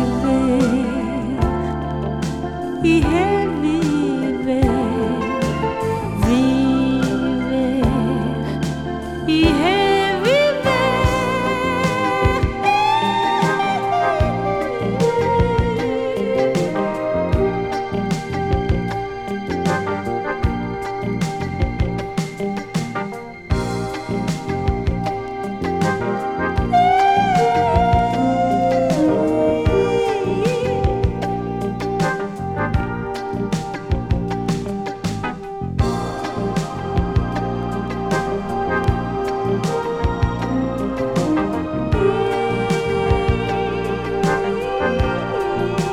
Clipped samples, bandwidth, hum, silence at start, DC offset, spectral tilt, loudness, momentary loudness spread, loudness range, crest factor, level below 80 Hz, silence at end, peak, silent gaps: under 0.1%; 15.5 kHz; none; 0 s; under 0.1%; -6.5 dB/octave; -20 LUFS; 8 LU; 6 LU; 16 dB; -30 dBFS; 0 s; -2 dBFS; none